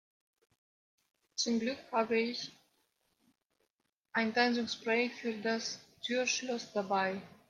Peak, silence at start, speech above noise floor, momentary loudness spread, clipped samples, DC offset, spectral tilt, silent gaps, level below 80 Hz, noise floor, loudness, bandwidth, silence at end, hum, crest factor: -14 dBFS; 1.35 s; 49 dB; 8 LU; under 0.1%; under 0.1%; -3 dB/octave; 3.70-3.77 s, 3.96-4.01 s; -82 dBFS; -83 dBFS; -34 LUFS; 10 kHz; 0.2 s; none; 22 dB